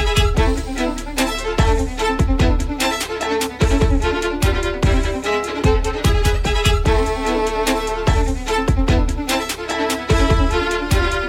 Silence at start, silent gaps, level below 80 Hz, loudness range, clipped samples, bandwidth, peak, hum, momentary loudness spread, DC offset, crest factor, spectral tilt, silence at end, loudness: 0 s; none; -20 dBFS; 1 LU; under 0.1%; 16.5 kHz; -2 dBFS; none; 4 LU; under 0.1%; 16 dB; -5 dB/octave; 0 s; -19 LUFS